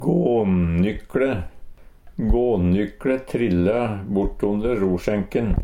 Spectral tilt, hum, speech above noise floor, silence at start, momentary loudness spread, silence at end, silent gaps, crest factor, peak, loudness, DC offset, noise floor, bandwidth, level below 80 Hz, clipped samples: -9 dB/octave; none; 20 dB; 0 s; 5 LU; 0 s; none; 14 dB; -6 dBFS; -22 LUFS; under 0.1%; -40 dBFS; 10.5 kHz; -32 dBFS; under 0.1%